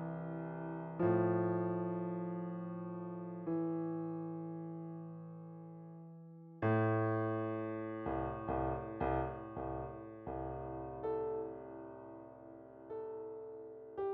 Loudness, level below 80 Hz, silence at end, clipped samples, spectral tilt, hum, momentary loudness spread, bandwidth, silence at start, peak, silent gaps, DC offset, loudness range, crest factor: -40 LUFS; -58 dBFS; 0 s; under 0.1%; -9 dB/octave; none; 18 LU; 3.8 kHz; 0 s; -20 dBFS; none; under 0.1%; 7 LU; 18 dB